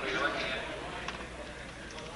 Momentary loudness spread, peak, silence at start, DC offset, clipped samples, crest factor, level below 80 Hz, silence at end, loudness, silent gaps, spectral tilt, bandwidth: 12 LU; -18 dBFS; 0 s; under 0.1%; under 0.1%; 18 dB; -52 dBFS; 0 s; -37 LUFS; none; -3.5 dB/octave; 11.5 kHz